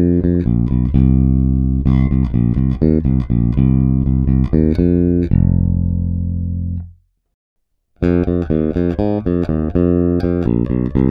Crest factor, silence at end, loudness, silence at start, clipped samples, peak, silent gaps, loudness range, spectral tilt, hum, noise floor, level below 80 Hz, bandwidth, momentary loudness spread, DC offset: 14 dB; 0 s; -16 LUFS; 0 s; under 0.1%; 0 dBFS; 7.34-7.56 s; 5 LU; -12 dB/octave; none; -41 dBFS; -22 dBFS; 5 kHz; 5 LU; under 0.1%